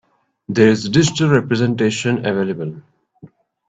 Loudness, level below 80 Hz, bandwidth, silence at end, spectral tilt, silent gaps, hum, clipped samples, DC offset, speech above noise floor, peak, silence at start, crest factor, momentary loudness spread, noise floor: -17 LUFS; -52 dBFS; 9 kHz; 0.4 s; -5.5 dB/octave; none; none; under 0.1%; under 0.1%; 29 dB; 0 dBFS; 0.5 s; 18 dB; 9 LU; -45 dBFS